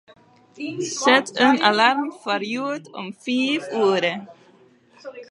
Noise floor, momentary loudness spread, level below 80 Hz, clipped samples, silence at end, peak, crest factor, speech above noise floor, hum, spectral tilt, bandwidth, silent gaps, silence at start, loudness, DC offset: -54 dBFS; 18 LU; -78 dBFS; under 0.1%; 0.05 s; -2 dBFS; 20 dB; 33 dB; none; -3 dB/octave; 11.5 kHz; none; 0.55 s; -20 LUFS; under 0.1%